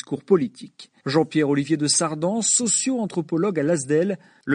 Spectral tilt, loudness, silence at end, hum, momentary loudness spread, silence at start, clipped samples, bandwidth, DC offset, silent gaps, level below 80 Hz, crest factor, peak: -4 dB/octave; -21 LUFS; 0 s; none; 8 LU; 0.1 s; under 0.1%; 10.5 kHz; under 0.1%; none; -66 dBFS; 16 dB; -6 dBFS